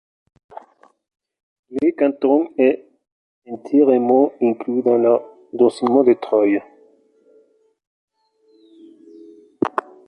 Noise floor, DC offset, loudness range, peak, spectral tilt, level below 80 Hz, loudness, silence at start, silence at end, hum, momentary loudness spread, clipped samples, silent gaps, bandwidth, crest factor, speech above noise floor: -59 dBFS; under 0.1%; 9 LU; -2 dBFS; -7.5 dB/octave; -68 dBFS; -18 LUFS; 1.7 s; 0.25 s; none; 10 LU; under 0.1%; 3.12-3.42 s, 7.87-8.08 s; 9.8 kHz; 18 dB; 43 dB